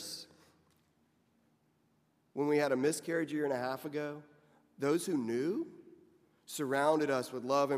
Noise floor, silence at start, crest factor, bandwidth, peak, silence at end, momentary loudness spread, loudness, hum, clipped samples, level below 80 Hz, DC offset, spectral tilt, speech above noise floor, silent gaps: -74 dBFS; 0 s; 20 dB; 15.5 kHz; -16 dBFS; 0 s; 14 LU; -34 LUFS; none; under 0.1%; -84 dBFS; under 0.1%; -5 dB/octave; 40 dB; none